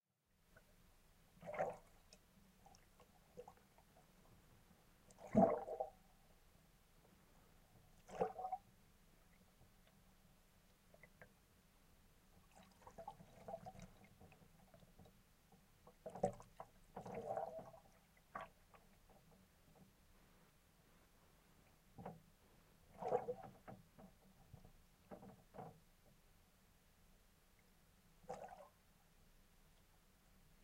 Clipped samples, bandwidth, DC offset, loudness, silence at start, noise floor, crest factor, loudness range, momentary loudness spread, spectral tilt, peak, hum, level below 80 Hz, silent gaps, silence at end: under 0.1%; 16 kHz; under 0.1%; -47 LUFS; 0.55 s; -80 dBFS; 32 dB; 20 LU; 24 LU; -7 dB/octave; -22 dBFS; none; -72 dBFS; none; 0.1 s